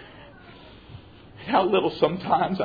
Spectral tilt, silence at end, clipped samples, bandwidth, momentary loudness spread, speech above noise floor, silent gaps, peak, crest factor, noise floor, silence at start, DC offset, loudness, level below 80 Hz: -8.5 dB/octave; 0 s; under 0.1%; 5 kHz; 25 LU; 24 dB; none; -6 dBFS; 20 dB; -47 dBFS; 0 s; under 0.1%; -23 LUFS; -56 dBFS